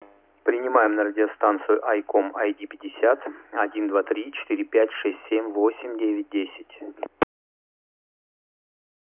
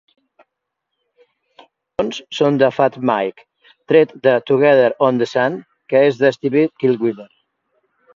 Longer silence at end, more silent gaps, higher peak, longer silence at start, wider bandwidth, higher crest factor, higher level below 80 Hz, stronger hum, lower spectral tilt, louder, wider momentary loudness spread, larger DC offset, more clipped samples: first, 1.95 s vs 0.95 s; neither; second, -6 dBFS vs 0 dBFS; second, 0.45 s vs 2 s; second, 3.8 kHz vs 7.4 kHz; about the same, 20 dB vs 18 dB; second, -68 dBFS vs -62 dBFS; neither; first, -8 dB/octave vs -6.5 dB/octave; second, -24 LUFS vs -16 LUFS; about the same, 10 LU vs 10 LU; neither; neither